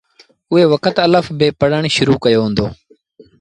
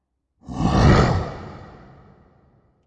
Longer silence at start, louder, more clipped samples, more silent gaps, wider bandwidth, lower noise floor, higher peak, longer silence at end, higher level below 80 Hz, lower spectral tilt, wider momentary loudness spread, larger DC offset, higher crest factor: about the same, 0.5 s vs 0.5 s; first, -14 LUFS vs -18 LUFS; neither; neither; first, 10.5 kHz vs 9 kHz; second, -47 dBFS vs -58 dBFS; about the same, 0 dBFS vs -2 dBFS; second, 0.65 s vs 1.2 s; second, -44 dBFS vs -30 dBFS; about the same, -6 dB/octave vs -7 dB/octave; second, 5 LU vs 23 LU; neither; second, 14 dB vs 20 dB